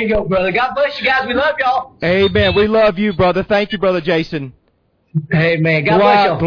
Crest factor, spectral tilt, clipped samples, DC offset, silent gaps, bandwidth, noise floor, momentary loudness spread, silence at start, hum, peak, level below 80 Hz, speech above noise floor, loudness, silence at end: 14 dB; -7.5 dB/octave; under 0.1%; under 0.1%; none; 5.4 kHz; -60 dBFS; 7 LU; 0 s; none; -2 dBFS; -38 dBFS; 46 dB; -14 LUFS; 0 s